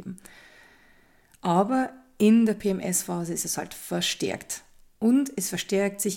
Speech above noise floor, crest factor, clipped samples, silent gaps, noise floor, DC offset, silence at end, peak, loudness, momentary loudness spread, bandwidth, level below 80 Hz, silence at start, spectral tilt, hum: 34 dB; 16 dB; under 0.1%; none; -59 dBFS; under 0.1%; 0 s; -10 dBFS; -26 LUFS; 13 LU; 17 kHz; -62 dBFS; 0 s; -4.5 dB/octave; none